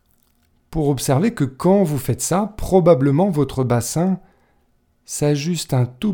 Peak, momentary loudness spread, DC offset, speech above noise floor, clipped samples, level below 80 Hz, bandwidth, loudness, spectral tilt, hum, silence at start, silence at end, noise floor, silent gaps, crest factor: -2 dBFS; 8 LU; under 0.1%; 44 dB; under 0.1%; -40 dBFS; 19 kHz; -19 LUFS; -6.5 dB/octave; none; 0.7 s; 0 s; -61 dBFS; none; 18 dB